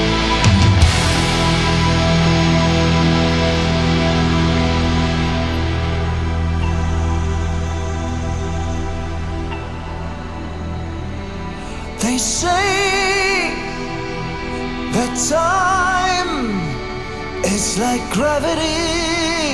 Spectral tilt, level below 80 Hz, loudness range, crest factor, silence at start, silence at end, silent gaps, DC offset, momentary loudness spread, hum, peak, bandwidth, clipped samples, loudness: -4.5 dB/octave; -28 dBFS; 9 LU; 16 dB; 0 s; 0 s; none; under 0.1%; 12 LU; none; 0 dBFS; 12 kHz; under 0.1%; -18 LUFS